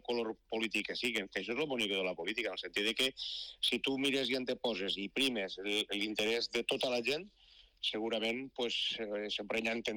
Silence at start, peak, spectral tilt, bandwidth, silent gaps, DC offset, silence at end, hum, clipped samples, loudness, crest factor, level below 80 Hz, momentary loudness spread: 0.1 s; -24 dBFS; -2.5 dB/octave; 19 kHz; none; under 0.1%; 0 s; none; under 0.1%; -35 LUFS; 12 dB; -70 dBFS; 5 LU